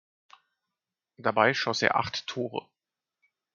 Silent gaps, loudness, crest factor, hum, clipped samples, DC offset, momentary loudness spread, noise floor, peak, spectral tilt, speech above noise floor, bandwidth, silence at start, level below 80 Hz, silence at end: none; -27 LUFS; 26 dB; none; under 0.1%; under 0.1%; 11 LU; -90 dBFS; -4 dBFS; -4 dB/octave; 62 dB; 7.6 kHz; 1.2 s; -66 dBFS; 0.95 s